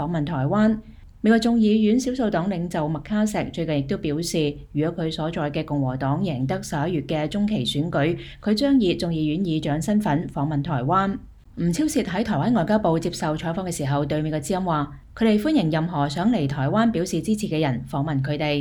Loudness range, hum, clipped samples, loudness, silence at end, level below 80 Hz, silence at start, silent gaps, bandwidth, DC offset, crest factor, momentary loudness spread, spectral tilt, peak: 3 LU; none; under 0.1%; -23 LUFS; 0 s; -46 dBFS; 0 s; none; 18 kHz; under 0.1%; 16 dB; 7 LU; -6.5 dB/octave; -6 dBFS